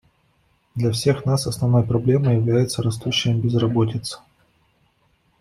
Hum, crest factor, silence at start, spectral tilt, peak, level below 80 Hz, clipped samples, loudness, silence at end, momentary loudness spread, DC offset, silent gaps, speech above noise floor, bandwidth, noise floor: none; 16 dB; 0.75 s; -6 dB/octave; -6 dBFS; -52 dBFS; under 0.1%; -20 LUFS; 1.25 s; 8 LU; under 0.1%; none; 44 dB; 13 kHz; -63 dBFS